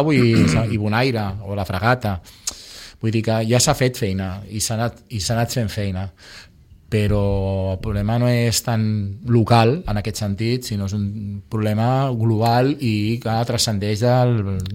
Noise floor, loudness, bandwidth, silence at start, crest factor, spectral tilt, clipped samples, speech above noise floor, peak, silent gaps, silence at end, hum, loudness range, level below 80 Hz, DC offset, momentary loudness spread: -39 dBFS; -20 LUFS; 16.5 kHz; 0 s; 16 dB; -5.5 dB/octave; under 0.1%; 20 dB; -4 dBFS; none; 0 s; none; 4 LU; -40 dBFS; under 0.1%; 11 LU